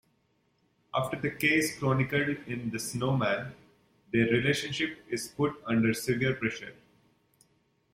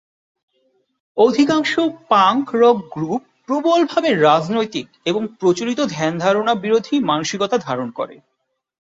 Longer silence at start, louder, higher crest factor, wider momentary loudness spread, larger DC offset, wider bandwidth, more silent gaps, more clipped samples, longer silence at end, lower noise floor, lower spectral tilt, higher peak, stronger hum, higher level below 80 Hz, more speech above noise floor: second, 0.95 s vs 1.15 s; second, -29 LUFS vs -18 LUFS; about the same, 18 dB vs 16 dB; about the same, 9 LU vs 10 LU; neither; first, 16.5 kHz vs 7.8 kHz; neither; neither; first, 1.2 s vs 0.85 s; first, -72 dBFS vs -64 dBFS; about the same, -5 dB/octave vs -5 dB/octave; second, -12 dBFS vs -2 dBFS; neither; about the same, -62 dBFS vs -62 dBFS; second, 43 dB vs 47 dB